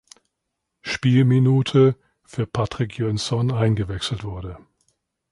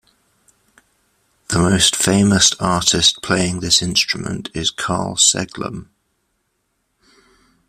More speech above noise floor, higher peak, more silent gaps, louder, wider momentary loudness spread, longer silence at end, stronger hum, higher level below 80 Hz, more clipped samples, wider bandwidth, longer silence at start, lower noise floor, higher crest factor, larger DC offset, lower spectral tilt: first, 59 dB vs 52 dB; second, -4 dBFS vs 0 dBFS; neither; second, -21 LUFS vs -15 LUFS; first, 18 LU vs 12 LU; second, 0.75 s vs 1.85 s; neither; about the same, -46 dBFS vs -46 dBFS; neither; second, 11.5 kHz vs 15.5 kHz; second, 0.85 s vs 1.5 s; first, -79 dBFS vs -69 dBFS; about the same, 16 dB vs 20 dB; neither; first, -7 dB/octave vs -2.5 dB/octave